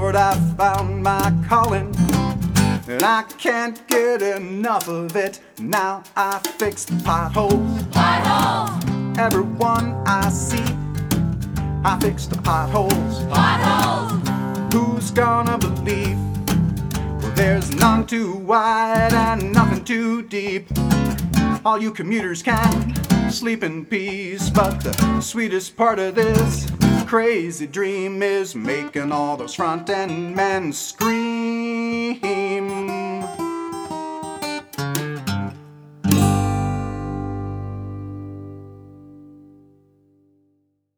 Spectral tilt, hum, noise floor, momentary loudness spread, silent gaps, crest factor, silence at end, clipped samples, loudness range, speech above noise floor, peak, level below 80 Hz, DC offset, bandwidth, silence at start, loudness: -5.5 dB/octave; 50 Hz at -40 dBFS; -66 dBFS; 10 LU; none; 20 dB; 1.55 s; under 0.1%; 6 LU; 47 dB; 0 dBFS; -36 dBFS; under 0.1%; over 20 kHz; 0 s; -20 LUFS